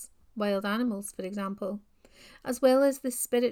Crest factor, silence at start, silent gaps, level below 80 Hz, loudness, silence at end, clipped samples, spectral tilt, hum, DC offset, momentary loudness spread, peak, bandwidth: 18 dB; 0 s; none; -66 dBFS; -29 LUFS; 0 s; under 0.1%; -4.5 dB/octave; none; under 0.1%; 14 LU; -10 dBFS; 19 kHz